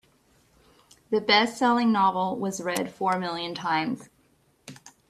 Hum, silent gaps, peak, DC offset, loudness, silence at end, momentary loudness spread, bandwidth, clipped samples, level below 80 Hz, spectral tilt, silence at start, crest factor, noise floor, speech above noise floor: none; none; -4 dBFS; under 0.1%; -25 LUFS; 0.2 s; 11 LU; 15 kHz; under 0.1%; -68 dBFS; -4 dB/octave; 1.1 s; 22 dB; -65 dBFS; 40 dB